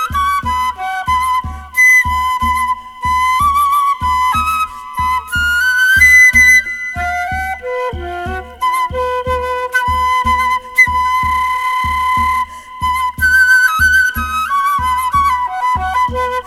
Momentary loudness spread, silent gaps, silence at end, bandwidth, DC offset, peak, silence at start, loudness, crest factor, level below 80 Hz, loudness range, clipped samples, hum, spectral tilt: 12 LU; none; 0 s; 17.5 kHz; under 0.1%; 0 dBFS; 0 s; -12 LUFS; 14 dB; -30 dBFS; 6 LU; under 0.1%; none; -2.5 dB/octave